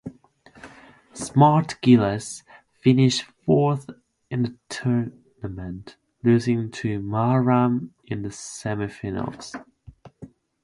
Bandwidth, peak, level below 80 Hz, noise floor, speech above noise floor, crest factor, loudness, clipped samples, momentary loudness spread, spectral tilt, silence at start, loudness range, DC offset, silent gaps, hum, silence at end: 11.5 kHz; -4 dBFS; -54 dBFS; -53 dBFS; 31 dB; 20 dB; -22 LUFS; under 0.1%; 18 LU; -6.5 dB/octave; 0.05 s; 6 LU; under 0.1%; none; none; 0.4 s